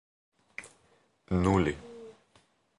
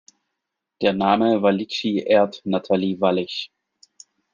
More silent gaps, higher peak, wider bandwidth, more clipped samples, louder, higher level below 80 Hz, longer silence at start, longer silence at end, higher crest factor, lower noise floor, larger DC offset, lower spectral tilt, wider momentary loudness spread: neither; second, -12 dBFS vs -2 dBFS; first, 11.5 kHz vs 7.4 kHz; neither; second, -29 LUFS vs -21 LUFS; first, -48 dBFS vs -64 dBFS; second, 0.6 s vs 0.8 s; second, 0.7 s vs 0.85 s; about the same, 22 dB vs 20 dB; second, -68 dBFS vs -81 dBFS; neither; about the same, -7 dB/octave vs -6.5 dB/octave; first, 23 LU vs 8 LU